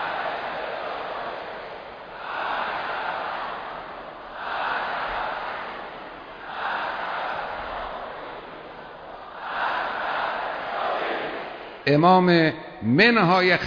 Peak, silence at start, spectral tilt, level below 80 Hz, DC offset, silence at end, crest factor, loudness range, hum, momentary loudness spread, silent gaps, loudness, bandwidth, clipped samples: -4 dBFS; 0 s; -7 dB/octave; -56 dBFS; under 0.1%; 0 s; 22 dB; 10 LU; none; 20 LU; none; -25 LUFS; 5.4 kHz; under 0.1%